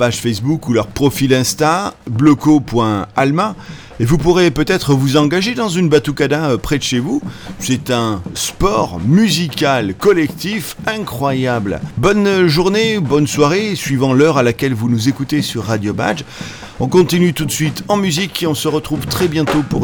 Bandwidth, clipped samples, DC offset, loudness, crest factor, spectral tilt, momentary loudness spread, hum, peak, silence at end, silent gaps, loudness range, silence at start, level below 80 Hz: over 20 kHz; under 0.1%; under 0.1%; -15 LUFS; 14 dB; -5.5 dB/octave; 8 LU; none; 0 dBFS; 0 s; none; 3 LU; 0 s; -36 dBFS